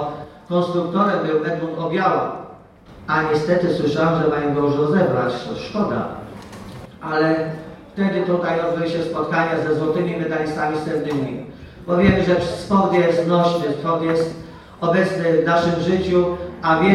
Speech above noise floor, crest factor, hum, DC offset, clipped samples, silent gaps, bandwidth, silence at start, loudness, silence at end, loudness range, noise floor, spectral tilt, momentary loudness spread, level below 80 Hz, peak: 24 dB; 18 dB; none; under 0.1%; under 0.1%; none; 11.5 kHz; 0 s; -20 LUFS; 0 s; 4 LU; -43 dBFS; -7 dB/octave; 16 LU; -48 dBFS; -2 dBFS